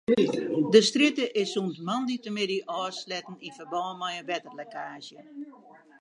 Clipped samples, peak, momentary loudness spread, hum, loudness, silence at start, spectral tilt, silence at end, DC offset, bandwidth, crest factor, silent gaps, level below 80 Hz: under 0.1%; -6 dBFS; 22 LU; none; -27 LUFS; 0.1 s; -4 dB/octave; 0.5 s; under 0.1%; 11 kHz; 22 dB; none; -74 dBFS